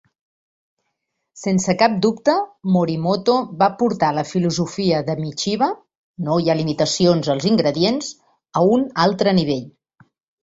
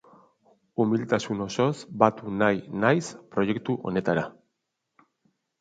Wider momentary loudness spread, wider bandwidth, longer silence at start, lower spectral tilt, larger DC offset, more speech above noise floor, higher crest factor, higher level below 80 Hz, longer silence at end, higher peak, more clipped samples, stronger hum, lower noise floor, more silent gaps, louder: about the same, 7 LU vs 6 LU; second, 8 kHz vs 9.2 kHz; first, 1.35 s vs 0.8 s; about the same, -5.5 dB/octave vs -6 dB/octave; neither; about the same, 58 dB vs 55 dB; second, 18 dB vs 24 dB; first, -56 dBFS vs -62 dBFS; second, 0.75 s vs 1.3 s; about the same, -2 dBFS vs -2 dBFS; neither; neither; second, -76 dBFS vs -80 dBFS; first, 5.97-6.14 s vs none; first, -19 LUFS vs -26 LUFS